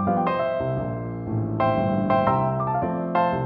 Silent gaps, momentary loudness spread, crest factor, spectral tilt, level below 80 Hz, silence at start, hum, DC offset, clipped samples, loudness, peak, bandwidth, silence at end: none; 7 LU; 14 dB; -11 dB/octave; -48 dBFS; 0 s; none; under 0.1%; under 0.1%; -24 LUFS; -8 dBFS; 5.8 kHz; 0 s